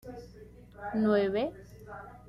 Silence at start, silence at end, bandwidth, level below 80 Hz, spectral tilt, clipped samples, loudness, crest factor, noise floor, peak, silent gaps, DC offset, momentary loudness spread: 0.05 s; 0 s; 12.5 kHz; -56 dBFS; -7.5 dB/octave; under 0.1%; -30 LUFS; 16 dB; -52 dBFS; -16 dBFS; none; under 0.1%; 25 LU